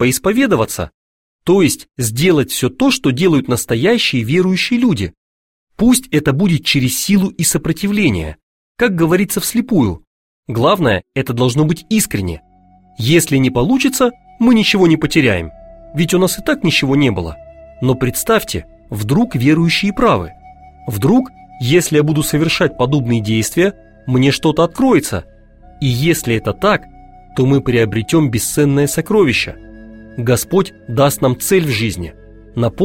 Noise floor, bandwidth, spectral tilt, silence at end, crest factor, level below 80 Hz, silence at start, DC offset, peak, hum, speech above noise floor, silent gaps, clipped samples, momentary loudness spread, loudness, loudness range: -48 dBFS; 16.5 kHz; -5 dB/octave; 0 s; 14 dB; -38 dBFS; 0 s; 0.3%; 0 dBFS; none; 34 dB; 0.94-1.39 s, 5.17-5.67 s, 8.43-8.75 s, 10.07-10.43 s; under 0.1%; 11 LU; -14 LUFS; 2 LU